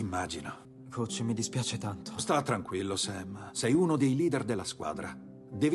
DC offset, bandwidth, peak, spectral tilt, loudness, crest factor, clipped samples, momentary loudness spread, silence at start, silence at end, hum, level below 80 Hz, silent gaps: under 0.1%; 12.5 kHz; -16 dBFS; -5 dB/octave; -32 LUFS; 16 dB; under 0.1%; 15 LU; 0 s; 0 s; none; -64 dBFS; none